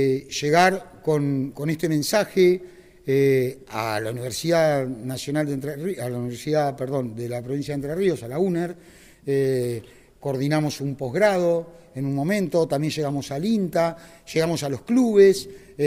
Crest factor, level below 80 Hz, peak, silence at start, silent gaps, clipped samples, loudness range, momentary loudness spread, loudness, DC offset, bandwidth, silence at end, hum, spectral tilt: 18 dB; -58 dBFS; -4 dBFS; 0 s; none; under 0.1%; 4 LU; 11 LU; -23 LUFS; under 0.1%; 16 kHz; 0 s; none; -6 dB/octave